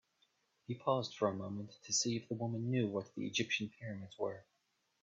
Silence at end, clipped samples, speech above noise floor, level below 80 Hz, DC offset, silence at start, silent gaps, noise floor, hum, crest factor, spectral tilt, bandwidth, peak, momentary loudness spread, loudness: 0.6 s; under 0.1%; 42 dB; -80 dBFS; under 0.1%; 0.7 s; none; -81 dBFS; none; 20 dB; -4.5 dB/octave; 8 kHz; -20 dBFS; 12 LU; -39 LUFS